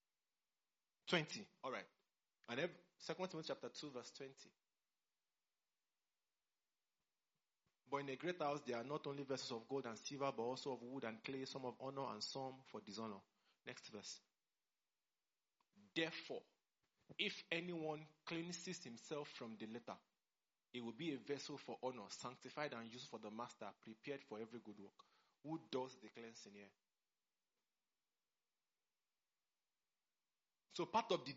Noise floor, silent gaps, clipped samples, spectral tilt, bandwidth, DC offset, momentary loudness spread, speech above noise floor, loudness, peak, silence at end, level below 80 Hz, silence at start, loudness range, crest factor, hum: under -90 dBFS; none; under 0.1%; -3 dB/octave; 7.6 kHz; under 0.1%; 13 LU; over 41 dB; -49 LUFS; -22 dBFS; 0 s; under -90 dBFS; 1.05 s; 9 LU; 28 dB; none